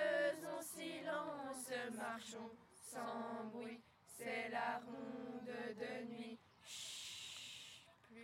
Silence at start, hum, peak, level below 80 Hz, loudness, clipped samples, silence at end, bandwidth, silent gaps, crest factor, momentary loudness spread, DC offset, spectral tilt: 0 s; none; -28 dBFS; -86 dBFS; -47 LUFS; under 0.1%; 0 s; 16 kHz; none; 20 dB; 12 LU; under 0.1%; -3 dB/octave